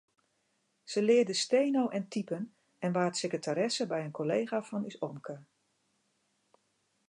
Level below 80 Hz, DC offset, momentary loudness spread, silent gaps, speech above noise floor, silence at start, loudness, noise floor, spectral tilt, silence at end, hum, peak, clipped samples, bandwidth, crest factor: -86 dBFS; under 0.1%; 13 LU; none; 45 dB; 0.85 s; -32 LUFS; -77 dBFS; -4.5 dB/octave; 1.65 s; none; -16 dBFS; under 0.1%; 11 kHz; 18 dB